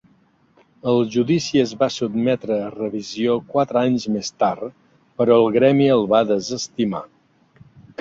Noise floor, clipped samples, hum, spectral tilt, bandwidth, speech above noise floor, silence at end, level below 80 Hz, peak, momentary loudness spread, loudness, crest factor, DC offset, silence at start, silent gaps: -58 dBFS; under 0.1%; none; -6 dB/octave; 7.8 kHz; 39 dB; 0.95 s; -60 dBFS; -2 dBFS; 12 LU; -19 LUFS; 18 dB; under 0.1%; 0.85 s; none